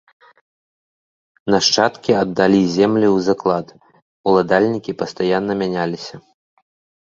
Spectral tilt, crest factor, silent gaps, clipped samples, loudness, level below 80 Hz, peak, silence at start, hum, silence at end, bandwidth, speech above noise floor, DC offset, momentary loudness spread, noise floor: -5 dB/octave; 18 dB; 4.02-4.24 s; under 0.1%; -17 LUFS; -56 dBFS; -2 dBFS; 1.45 s; none; 0.85 s; 7.8 kHz; over 73 dB; under 0.1%; 11 LU; under -90 dBFS